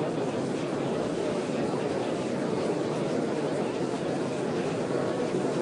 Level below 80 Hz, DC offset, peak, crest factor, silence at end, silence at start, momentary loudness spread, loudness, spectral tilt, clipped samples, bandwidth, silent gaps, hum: -64 dBFS; under 0.1%; -16 dBFS; 12 dB; 0 s; 0 s; 1 LU; -29 LUFS; -6 dB/octave; under 0.1%; 11 kHz; none; none